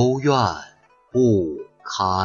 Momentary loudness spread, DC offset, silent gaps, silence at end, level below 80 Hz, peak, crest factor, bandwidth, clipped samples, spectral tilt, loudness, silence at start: 14 LU; under 0.1%; none; 0 s; -54 dBFS; -4 dBFS; 16 dB; 7.2 kHz; under 0.1%; -6.5 dB/octave; -21 LUFS; 0 s